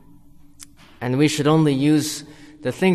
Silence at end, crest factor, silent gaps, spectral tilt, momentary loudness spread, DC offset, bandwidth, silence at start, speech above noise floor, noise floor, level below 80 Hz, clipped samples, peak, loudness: 0 s; 16 dB; none; -5.5 dB/octave; 13 LU; under 0.1%; 13 kHz; 0.6 s; 28 dB; -46 dBFS; -56 dBFS; under 0.1%; -6 dBFS; -20 LUFS